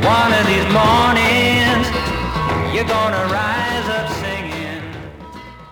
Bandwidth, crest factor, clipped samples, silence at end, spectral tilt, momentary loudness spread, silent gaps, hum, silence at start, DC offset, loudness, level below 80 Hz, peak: over 20 kHz; 14 dB; under 0.1%; 0 s; -5 dB/octave; 18 LU; none; none; 0 s; under 0.1%; -16 LUFS; -36 dBFS; -2 dBFS